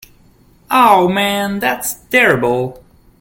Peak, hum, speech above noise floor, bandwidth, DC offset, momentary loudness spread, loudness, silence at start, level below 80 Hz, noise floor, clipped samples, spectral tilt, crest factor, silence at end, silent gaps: 0 dBFS; none; 35 dB; 17 kHz; under 0.1%; 9 LU; -13 LUFS; 0.7 s; -48 dBFS; -49 dBFS; under 0.1%; -4 dB/octave; 16 dB; 0.45 s; none